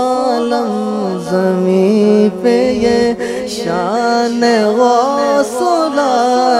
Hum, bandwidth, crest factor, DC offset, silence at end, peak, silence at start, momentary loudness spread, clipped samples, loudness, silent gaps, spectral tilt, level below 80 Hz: none; 15 kHz; 12 dB; under 0.1%; 0 s; 0 dBFS; 0 s; 6 LU; under 0.1%; -13 LUFS; none; -5.5 dB/octave; -48 dBFS